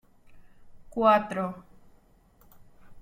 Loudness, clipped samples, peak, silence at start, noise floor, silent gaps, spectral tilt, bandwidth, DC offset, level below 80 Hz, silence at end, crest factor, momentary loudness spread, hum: -26 LUFS; under 0.1%; -8 dBFS; 0.3 s; -60 dBFS; none; -6.5 dB/octave; 16 kHz; under 0.1%; -58 dBFS; 0 s; 24 dB; 17 LU; none